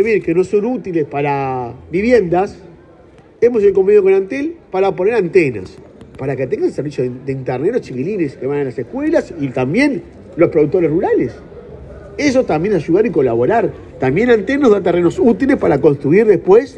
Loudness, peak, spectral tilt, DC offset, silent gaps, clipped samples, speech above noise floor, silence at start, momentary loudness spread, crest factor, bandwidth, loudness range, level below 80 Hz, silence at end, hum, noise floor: -15 LUFS; 0 dBFS; -7.5 dB/octave; under 0.1%; none; under 0.1%; 29 dB; 0 s; 11 LU; 14 dB; 9 kHz; 5 LU; -44 dBFS; 0 s; none; -43 dBFS